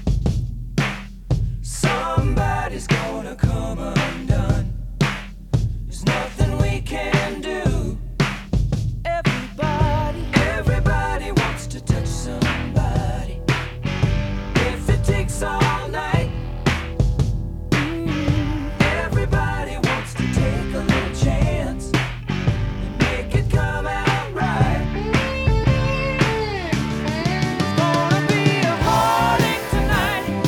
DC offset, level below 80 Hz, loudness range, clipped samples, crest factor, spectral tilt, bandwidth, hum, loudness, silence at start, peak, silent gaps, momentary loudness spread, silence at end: under 0.1%; -28 dBFS; 3 LU; under 0.1%; 18 dB; -6 dB/octave; 18 kHz; none; -21 LUFS; 0 s; -2 dBFS; none; 6 LU; 0 s